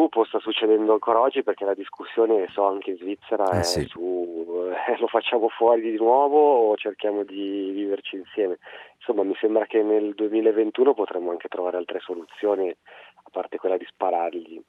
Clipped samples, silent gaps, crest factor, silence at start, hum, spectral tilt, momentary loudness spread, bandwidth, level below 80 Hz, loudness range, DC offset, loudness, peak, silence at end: under 0.1%; none; 18 dB; 0 s; none; -5 dB/octave; 11 LU; 13 kHz; -60 dBFS; 5 LU; under 0.1%; -23 LUFS; -6 dBFS; 0.1 s